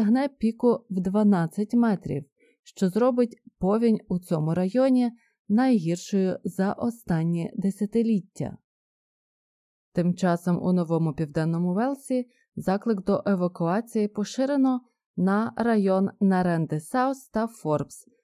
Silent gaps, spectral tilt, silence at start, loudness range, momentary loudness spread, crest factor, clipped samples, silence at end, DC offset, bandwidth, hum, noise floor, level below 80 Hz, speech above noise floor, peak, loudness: 2.32-2.36 s, 2.59-2.63 s, 5.39-5.45 s, 8.64-9.92 s, 15.06-15.14 s; -8 dB/octave; 0 s; 4 LU; 7 LU; 16 dB; under 0.1%; 0.25 s; under 0.1%; 14.5 kHz; none; under -90 dBFS; -60 dBFS; over 66 dB; -10 dBFS; -25 LUFS